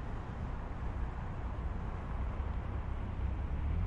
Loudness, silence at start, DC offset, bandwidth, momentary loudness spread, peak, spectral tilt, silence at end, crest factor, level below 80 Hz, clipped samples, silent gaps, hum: -41 LUFS; 0 s; under 0.1%; 6.6 kHz; 4 LU; -26 dBFS; -8.5 dB/octave; 0 s; 12 dB; -38 dBFS; under 0.1%; none; none